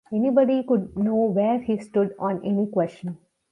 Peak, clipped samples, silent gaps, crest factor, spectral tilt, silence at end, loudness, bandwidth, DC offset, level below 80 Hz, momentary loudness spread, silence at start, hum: -8 dBFS; under 0.1%; none; 16 dB; -9 dB/octave; 0.35 s; -23 LUFS; 9.6 kHz; under 0.1%; -60 dBFS; 9 LU; 0.1 s; none